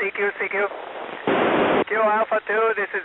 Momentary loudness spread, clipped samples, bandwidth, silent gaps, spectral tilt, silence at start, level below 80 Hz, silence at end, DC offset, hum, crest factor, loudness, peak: 8 LU; under 0.1%; 4.1 kHz; none; -7.5 dB/octave; 0 s; -64 dBFS; 0 s; under 0.1%; none; 14 dB; -21 LUFS; -8 dBFS